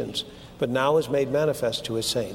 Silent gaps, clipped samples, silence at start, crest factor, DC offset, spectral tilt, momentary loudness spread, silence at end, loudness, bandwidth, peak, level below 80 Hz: none; under 0.1%; 0 s; 16 dB; under 0.1%; -4.5 dB/octave; 9 LU; 0 s; -25 LUFS; 17 kHz; -10 dBFS; -54 dBFS